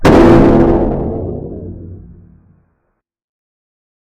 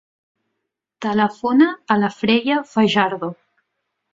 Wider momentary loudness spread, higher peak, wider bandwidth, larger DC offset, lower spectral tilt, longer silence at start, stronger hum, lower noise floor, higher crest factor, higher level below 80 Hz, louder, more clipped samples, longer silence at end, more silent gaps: first, 24 LU vs 9 LU; about the same, 0 dBFS vs -2 dBFS; first, 10.5 kHz vs 7.6 kHz; neither; first, -8 dB/octave vs -6 dB/octave; second, 0 s vs 1 s; neither; second, -66 dBFS vs -78 dBFS; second, 12 dB vs 18 dB; first, -24 dBFS vs -64 dBFS; first, -10 LUFS vs -18 LUFS; first, 0.8% vs under 0.1%; first, 2.05 s vs 0.8 s; neither